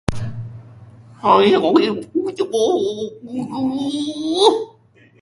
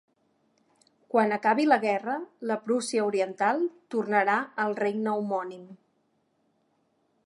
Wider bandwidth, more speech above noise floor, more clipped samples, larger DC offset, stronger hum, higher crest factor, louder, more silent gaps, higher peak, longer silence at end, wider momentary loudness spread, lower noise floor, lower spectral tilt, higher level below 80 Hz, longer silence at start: about the same, 11.5 kHz vs 11.5 kHz; second, 34 dB vs 45 dB; neither; neither; neither; about the same, 18 dB vs 22 dB; first, -18 LUFS vs -27 LUFS; neither; first, 0 dBFS vs -8 dBFS; second, 0.55 s vs 1.5 s; first, 15 LU vs 9 LU; second, -51 dBFS vs -72 dBFS; about the same, -5.5 dB/octave vs -5 dB/octave; first, -46 dBFS vs -84 dBFS; second, 0.1 s vs 1.15 s